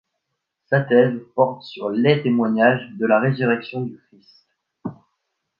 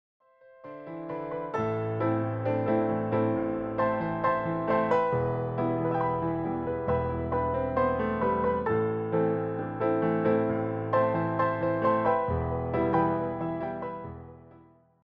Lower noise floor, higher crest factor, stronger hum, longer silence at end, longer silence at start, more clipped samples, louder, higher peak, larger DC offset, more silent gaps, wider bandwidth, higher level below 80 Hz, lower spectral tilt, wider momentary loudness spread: first, -78 dBFS vs -57 dBFS; about the same, 20 dB vs 16 dB; neither; first, 0.65 s vs 0.5 s; about the same, 0.7 s vs 0.65 s; neither; first, -19 LUFS vs -28 LUFS; first, -2 dBFS vs -14 dBFS; neither; neither; about the same, 5.8 kHz vs 5.4 kHz; second, -68 dBFS vs -50 dBFS; about the same, -9.5 dB/octave vs -10 dB/octave; first, 16 LU vs 8 LU